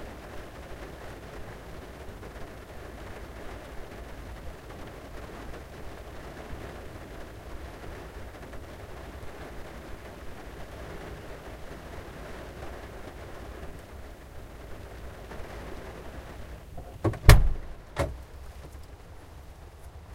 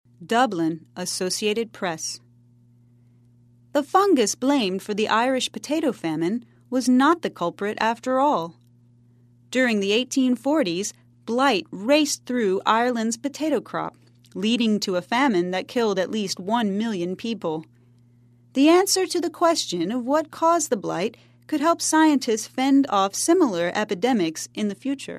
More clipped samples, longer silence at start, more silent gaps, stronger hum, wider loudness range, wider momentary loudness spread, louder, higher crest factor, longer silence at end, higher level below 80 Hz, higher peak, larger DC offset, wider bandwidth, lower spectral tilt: neither; second, 0 s vs 0.2 s; neither; neither; first, 16 LU vs 4 LU; about the same, 12 LU vs 10 LU; second, -35 LUFS vs -22 LUFS; first, 32 dB vs 18 dB; about the same, 0 s vs 0 s; first, -36 dBFS vs -72 dBFS; first, 0 dBFS vs -4 dBFS; neither; first, 16 kHz vs 14 kHz; first, -5.5 dB/octave vs -3.5 dB/octave